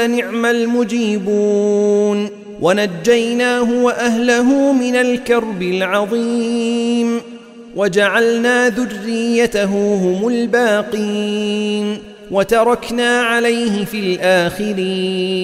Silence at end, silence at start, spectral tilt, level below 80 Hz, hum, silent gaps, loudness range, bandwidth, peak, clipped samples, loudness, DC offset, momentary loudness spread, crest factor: 0 s; 0 s; -4.5 dB/octave; -50 dBFS; none; none; 2 LU; 15 kHz; -2 dBFS; under 0.1%; -15 LUFS; under 0.1%; 6 LU; 14 dB